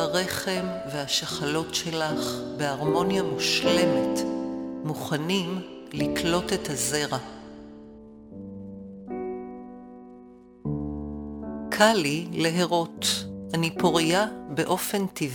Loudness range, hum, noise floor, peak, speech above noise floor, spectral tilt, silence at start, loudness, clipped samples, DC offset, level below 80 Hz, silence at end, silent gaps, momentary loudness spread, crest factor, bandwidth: 12 LU; none; -49 dBFS; -6 dBFS; 23 dB; -4 dB/octave; 0 s; -26 LUFS; under 0.1%; under 0.1%; -52 dBFS; 0 s; none; 20 LU; 22 dB; 17.5 kHz